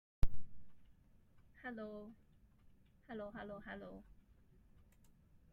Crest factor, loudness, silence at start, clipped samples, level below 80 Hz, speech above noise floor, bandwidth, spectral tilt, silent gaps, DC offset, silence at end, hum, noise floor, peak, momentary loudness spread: 22 dB; -50 LUFS; 0.2 s; under 0.1%; -52 dBFS; 17 dB; 4.3 kHz; -7.5 dB/octave; none; under 0.1%; 1.5 s; none; -67 dBFS; -18 dBFS; 22 LU